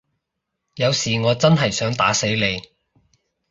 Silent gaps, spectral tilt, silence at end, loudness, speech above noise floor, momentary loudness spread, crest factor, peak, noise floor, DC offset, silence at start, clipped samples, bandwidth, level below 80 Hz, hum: none; -4 dB/octave; 0.9 s; -19 LUFS; 60 dB; 6 LU; 20 dB; -2 dBFS; -79 dBFS; under 0.1%; 0.75 s; under 0.1%; 8 kHz; -52 dBFS; none